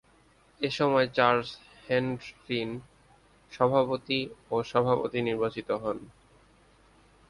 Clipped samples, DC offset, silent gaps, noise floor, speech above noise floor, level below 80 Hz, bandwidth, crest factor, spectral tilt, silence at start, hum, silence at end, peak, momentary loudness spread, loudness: under 0.1%; under 0.1%; none; -62 dBFS; 34 dB; -62 dBFS; 11 kHz; 22 dB; -6 dB/octave; 0.6 s; none; 1.2 s; -8 dBFS; 14 LU; -28 LUFS